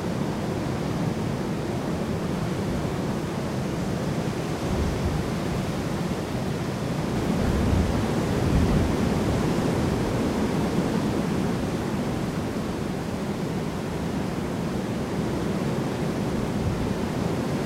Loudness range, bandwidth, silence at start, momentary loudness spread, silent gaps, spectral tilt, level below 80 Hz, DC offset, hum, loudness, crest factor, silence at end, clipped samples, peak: 4 LU; 16 kHz; 0 s; 5 LU; none; -6.5 dB/octave; -36 dBFS; under 0.1%; none; -27 LUFS; 16 dB; 0 s; under 0.1%; -10 dBFS